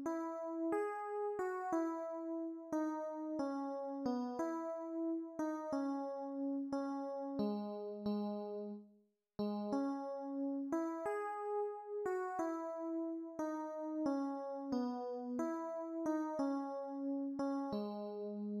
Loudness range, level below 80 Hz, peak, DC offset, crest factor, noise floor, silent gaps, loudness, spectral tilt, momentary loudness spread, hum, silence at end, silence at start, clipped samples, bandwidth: 1 LU; -82 dBFS; -26 dBFS; under 0.1%; 16 dB; -72 dBFS; none; -41 LUFS; -7 dB/octave; 5 LU; none; 0 s; 0 s; under 0.1%; 12.5 kHz